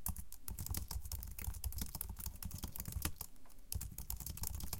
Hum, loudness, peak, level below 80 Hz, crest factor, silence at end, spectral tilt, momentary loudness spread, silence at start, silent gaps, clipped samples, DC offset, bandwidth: none; -45 LUFS; -16 dBFS; -50 dBFS; 28 dB; 0 s; -3.5 dB/octave; 6 LU; 0 s; none; under 0.1%; under 0.1%; 17 kHz